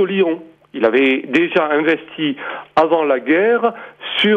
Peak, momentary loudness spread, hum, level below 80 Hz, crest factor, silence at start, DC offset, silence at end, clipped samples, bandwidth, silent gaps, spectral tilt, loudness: -2 dBFS; 9 LU; none; -60 dBFS; 14 dB; 0 s; under 0.1%; 0 s; under 0.1%; 8 kHz; none; -6.5 dB/octave; -16 LUFS